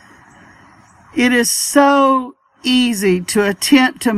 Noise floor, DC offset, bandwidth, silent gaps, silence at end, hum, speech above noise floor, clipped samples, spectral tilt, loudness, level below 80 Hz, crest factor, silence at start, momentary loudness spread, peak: -46 dBFS; under 0.1%; 15.5 kHz; none; 0 s; none; 32 dB; under 0.1%; -3 dB/octave; -14 LUFS; -56 dBFS; 16 dB; 1.15 s; 8 LU; 0 dBFS